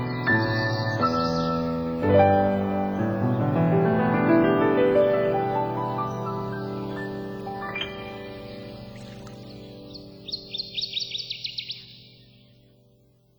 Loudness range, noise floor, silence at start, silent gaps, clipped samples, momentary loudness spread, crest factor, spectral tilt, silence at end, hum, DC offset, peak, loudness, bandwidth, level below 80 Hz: 13 LU; -60 dBFS; 0 s; none; under 0.1%; 20 LU; 18 dB; -7 dB/octave; 1.35 s; none; under 0.1%; -6 dBFS; -24 LUFS; over 20 kHz; -52 dBFS